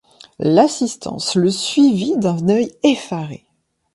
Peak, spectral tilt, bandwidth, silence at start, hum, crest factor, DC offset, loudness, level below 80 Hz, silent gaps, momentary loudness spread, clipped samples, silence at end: 0 dBFS; -5.5 dB/octave; 11.5 kHz; 0.4 s; none; 18 dB; under 0.1%; -17 LUFS; -58 dBFS; none; 9 LU; under 0.1%; 0.6 s